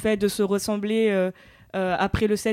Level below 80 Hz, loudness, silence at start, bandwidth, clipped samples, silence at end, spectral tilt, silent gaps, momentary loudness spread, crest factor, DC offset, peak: -44 dBFS; -24 LUFS; 0 s; 16 kHz; under 0.1%; 0 s; -5 dB/octave; none; 6 LU; 14 dB; under 0.1%; -10 dBFS